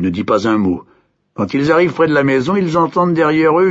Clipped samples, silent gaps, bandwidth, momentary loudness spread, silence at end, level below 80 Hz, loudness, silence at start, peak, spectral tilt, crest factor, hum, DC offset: under 0.1%; none; 8 kHz; 7 LU; 0 s; -50 dBFS; -14 LUFS; 0 s; -2 dBFS; -7.5 dB/octave; 12 dB; none; under 0.1%